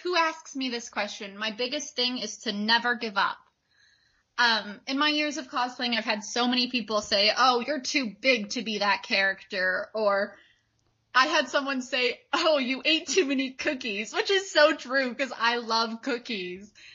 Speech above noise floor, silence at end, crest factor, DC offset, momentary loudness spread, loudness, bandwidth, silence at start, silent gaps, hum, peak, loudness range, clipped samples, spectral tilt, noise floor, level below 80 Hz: 44 dB; 0 s; 20 dB; under 0.1%; 9 LU; -26 LUFS; 8 kHz; 0 s; none; none; -6 dBFS; 3 LU; under 0.1%; -2 dB/octave; -71 dBFS; -74 dBFS